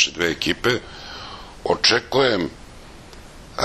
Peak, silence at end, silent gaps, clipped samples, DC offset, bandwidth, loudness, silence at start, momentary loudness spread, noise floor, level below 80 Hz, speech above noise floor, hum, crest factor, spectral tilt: -2 dBFS; 0 s; none; under 0.1%; under 0.1%; 13.5 kHz; -20 LUFS; 0 s; 19 LU; -41 dBFS; -46 dBFS; 20 dB; none; 22 dB; -3 dB/octave